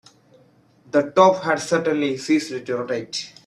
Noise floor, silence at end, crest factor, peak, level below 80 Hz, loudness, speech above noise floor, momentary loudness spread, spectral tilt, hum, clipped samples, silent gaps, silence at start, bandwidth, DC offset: -56 dBFS; 0.2 s; 20 dB; 0 dBFS; -66 dBFS; -21 LUFS; 35 dB; 11 LU; -4.5 dB/octave; none; under 0.1%; none; 0.95 s; 12.5 kHz; under 0.1%